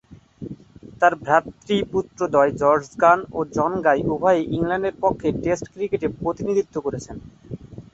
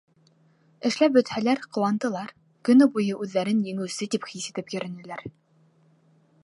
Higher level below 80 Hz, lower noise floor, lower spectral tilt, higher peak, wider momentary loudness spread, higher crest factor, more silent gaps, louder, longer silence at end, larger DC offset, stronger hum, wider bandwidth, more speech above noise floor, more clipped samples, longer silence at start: first, -50 dBFS vs -72 dBFS; second, -42 dBFS vs -61 dBFS; about the same, -6 dB/octave vs -5.5 dB/octave; first, -2 dBFS vs -8 dBFS; first, 20 LU vs 17 LU; about the same, 20 dB vs 18 dB; neither; first, -21 LUFS vs -25 LUFS; second, 0.15 s vs 1.15 s; neither; neither; second, 8 kHz vs 11.5 kHz; second, 22 dB vs 37 dB; neither; second, 0.1 s vs 0.8 s